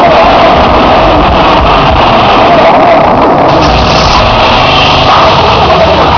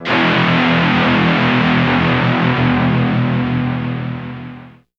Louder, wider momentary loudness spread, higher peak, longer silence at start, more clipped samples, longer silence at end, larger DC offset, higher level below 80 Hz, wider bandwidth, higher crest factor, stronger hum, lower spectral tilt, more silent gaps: first, -4 LUFS vs -14 LUFS; second, 2 LU vs 11 LU; about the same, 0 dBFS vs 0 dBFS; about the same, 0 s vs 0 s; first, 10% vs under 0.1%; second, 0 s vs 0.3 s; first, 0.9% vs under 0.1%; first, -18 dBFS vs -40 dBFS; second, 5.4 kHz vs 7 kHz; second, 4 dB vs 14 dB; neither; second, -5.5 dB/octave vs -7.5 dB/octave; neither